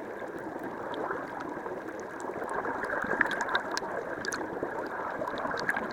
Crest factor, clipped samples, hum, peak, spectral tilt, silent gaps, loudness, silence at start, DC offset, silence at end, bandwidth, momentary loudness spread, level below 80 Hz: 26 dB; under 0.1%; none; -8 dBFS; -3.5 dB/octave; none; -34 LUFS; 0 s; under 0.1%; 0 s; 19 kHz; 10 LU; -64 dBFS